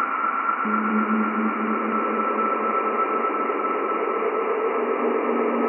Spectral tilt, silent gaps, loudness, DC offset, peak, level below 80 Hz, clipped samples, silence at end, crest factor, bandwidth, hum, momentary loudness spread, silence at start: -10.5 dB/octave; none; -23 LUFS; under 0.1%; -10 dBFS; under -90 dBFS; under 0.1%; 0 s; 12 dB; 3.1 kHz; none; 2 LU; 0 s